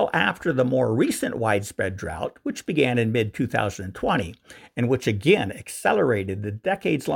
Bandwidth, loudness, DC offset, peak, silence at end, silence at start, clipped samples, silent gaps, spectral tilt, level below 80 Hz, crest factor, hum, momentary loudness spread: 17 kHz; -24 LUFS; under 0.1%; -4 dBFS; 0 s; 0 s; under 0.1%; none; -5.5 dB/octave; -52 dBFS; 18 dB; none; 9 LU